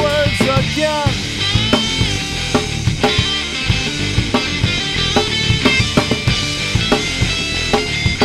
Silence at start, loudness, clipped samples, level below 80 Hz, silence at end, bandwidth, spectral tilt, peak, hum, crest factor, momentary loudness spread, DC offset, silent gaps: 0 s; -16 LUFS; under 0.1%; -28 dBFS; 0 s; 15.5 kHz; -4 dB/octave; 0 dBFS; none; 16 dB; 4 LU; under 0.1%; none